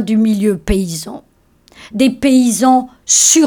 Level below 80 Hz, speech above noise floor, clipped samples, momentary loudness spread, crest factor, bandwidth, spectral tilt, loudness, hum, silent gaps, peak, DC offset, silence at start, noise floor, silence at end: -32 dBFS; 36 dB; under 0.1%; 14 LU; 12 dB; 20 kHz; -3.5 dB/octave; -13 LUFS; none; none; 0 dBFS; under 0.1%; 0 s; -49 dBFS; 0 s